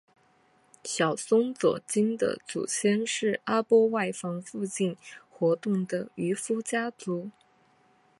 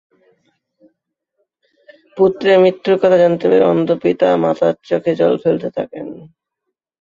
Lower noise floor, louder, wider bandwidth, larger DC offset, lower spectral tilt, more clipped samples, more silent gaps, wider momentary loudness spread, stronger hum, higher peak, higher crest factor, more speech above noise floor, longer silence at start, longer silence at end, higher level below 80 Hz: second, -64 dBFS vs -77 dBFS; second, -28 LUFS vs -14 LUFS; first, 11.5 kHz vs 7.4 kHz; neither; second, -4.5 dB/octave vs -7.5 dB/octave; neither; neither; about the same, 11 LU vs 13 LU; neither; second, -10 dBFS vs -2 dBFS; about the same, 18 dB vs 16 dB; second, 37 dB vs 64 dB; second, 0.85 s vs 2.15 s; about the same, 0.9 s vs 0.8 s; second, -76 dBFS vs -58 dBFS